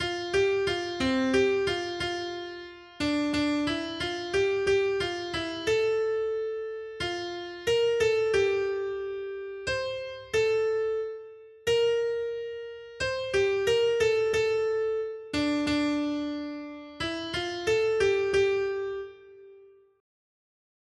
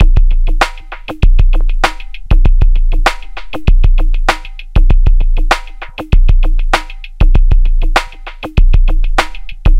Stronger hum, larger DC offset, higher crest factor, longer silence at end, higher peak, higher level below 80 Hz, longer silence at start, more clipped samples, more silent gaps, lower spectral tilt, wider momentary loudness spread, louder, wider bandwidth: neither; neither; first, 16 dB vs 8 dB; first, 1.35 s vs 0 s; second, -14 dBFS vs 0 dBFS; second, -56 dBFS vs -8 dBFS; about the same, 0 s vs 0 s; second, under 0.1% vs 0.3%; neither; second, -4 dB/octave vs -5.5 dB/octave; about the same, 11 LU vs 13 LU; second, -28 LUFS vs -15 LUFS; first, 12.5 kHz vs 8.2 kHz